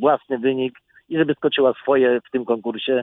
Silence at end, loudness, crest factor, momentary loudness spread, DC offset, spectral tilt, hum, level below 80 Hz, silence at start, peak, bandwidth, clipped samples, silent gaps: 0 s; -20 LUFS; 16 dB; 7 LU; under 0.1%; -8.5 dB/octave; none; -66 dBFS; 0 s; -4 dBFS; 4 kHz; under 0.1%; none